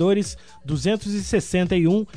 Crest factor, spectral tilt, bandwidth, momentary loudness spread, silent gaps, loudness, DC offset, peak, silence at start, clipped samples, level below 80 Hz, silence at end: 14 dB; -6 dB/octave; 11 kHz; 10 LU; none; -22 LUFS; 0.4%; -8 dBFS; 0 s; under 0.1%; -42 dBFS; 0.1 s